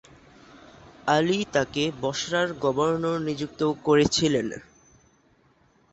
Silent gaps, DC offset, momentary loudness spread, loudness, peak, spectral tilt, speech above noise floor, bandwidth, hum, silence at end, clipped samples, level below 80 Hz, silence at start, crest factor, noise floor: none; under 0.1%; 8 LU; -25 LUFS; -8 dBFS; -4.5 dB/octave; 38 dB; 8.2 kHz; none; 1.3 s; under 0.1%; -56 dBFS; 1.05 s; 20 dB; -62 dBFS